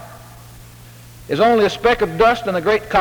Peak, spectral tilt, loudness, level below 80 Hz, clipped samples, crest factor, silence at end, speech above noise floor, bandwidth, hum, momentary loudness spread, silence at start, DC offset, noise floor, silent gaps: -2 dBFS; -5 dB/octave; -16 LUFS; -42 dBFS; under 0.1%; 16 dB; 0 s; 25 dB; over 20 kHz; none; 4 LU; 0 s; under 0.1%; -40 dBFS; none